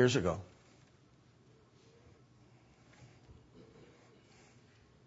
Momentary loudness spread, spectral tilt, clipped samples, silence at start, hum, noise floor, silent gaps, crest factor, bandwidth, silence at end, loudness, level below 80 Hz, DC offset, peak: 26 LU; -5 dB/octave; under 0.1%; 0 s; none; -65 dBFS; none; 26 dB; 7.6 kHz; 4.6 s; -34 LUFS; -66 dBFS; under 0.1%; -16 dBFS